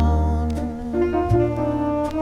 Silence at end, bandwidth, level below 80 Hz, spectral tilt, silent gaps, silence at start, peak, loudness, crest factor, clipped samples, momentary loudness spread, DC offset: 0 s; 9.4 kHz; -26 dBFS; -9 dB/octave; none; 0 s; -6 dBFS; -22 LUFS; 14 dB; under 0.1%; 6 LU; under 0.1%